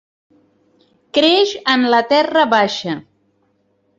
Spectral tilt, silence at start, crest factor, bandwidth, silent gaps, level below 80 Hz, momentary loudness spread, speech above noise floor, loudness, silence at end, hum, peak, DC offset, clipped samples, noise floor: -4 dB/octave; 1.15 s; 16 dB; 7.8 kHz; none; -64 dBFS; 10 LU; 48 dB; -15 LUFS; 1 s; none; -2 dBFS; under 0.1%; under 0.1%; -62 dBFS